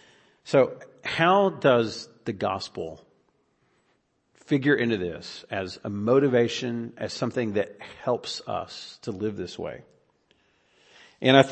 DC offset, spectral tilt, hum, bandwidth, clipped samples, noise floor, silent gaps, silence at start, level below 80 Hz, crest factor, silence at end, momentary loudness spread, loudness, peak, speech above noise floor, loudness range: under 0.1%; -5.5 dB/octave; none; 8.8 kHz; under 0.1%; -70 dBFS; none; 0.45 s; -66 dBFS; 24 dB; 0 s; 16 LU; -26 LUFS; -2 dBFS; 45 dB; 7 LU